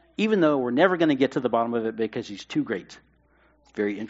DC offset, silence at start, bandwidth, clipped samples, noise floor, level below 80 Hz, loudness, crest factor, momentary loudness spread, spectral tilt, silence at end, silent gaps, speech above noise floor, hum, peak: under 0.1%; 0.2 s; 8 kHz; under 0.1%; -61 dBFS; -66 dBFS; -24 LUFS; 20 dB; 11 LU; -4.5 dB/octave; 0 s; none; 37 dB; none; -4 dBFS